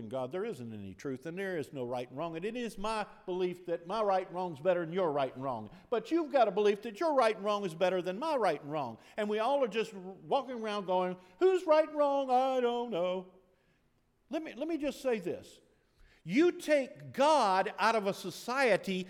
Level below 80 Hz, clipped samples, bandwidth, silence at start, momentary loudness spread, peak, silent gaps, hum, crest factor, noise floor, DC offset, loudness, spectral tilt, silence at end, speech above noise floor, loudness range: -66 dBFS; under 0.1%; 15.5 kHz; 0 s; 12 LU; -14 dBFS; none; none; 18 dB; -72 dBFS; under 0.1%; -32 LUFS; -5 dB/octave; 0 s; 40 dB; 7 LU